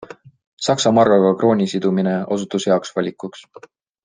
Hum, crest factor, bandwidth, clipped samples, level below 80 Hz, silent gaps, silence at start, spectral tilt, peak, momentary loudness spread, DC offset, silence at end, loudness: none; 18 dB; 9.8 kHz; under 0.1%; -62 dBFS; 0.47-0.57 s; 0 s; -5.5 dB/octave; -2 dBFS; 11 LU; under 0.1%; 0.65 s; -17 LUFS